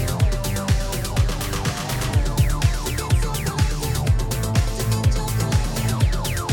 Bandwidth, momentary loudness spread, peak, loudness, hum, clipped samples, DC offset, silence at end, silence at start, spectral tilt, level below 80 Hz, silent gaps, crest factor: 17.5 kHz; 4 LU; -6 dBFS; -22 LUFS; none; under 0.1%; under 0.1%; 0 s; 0 s; -5 dB/octave; -26 dBFS; none; 16 dB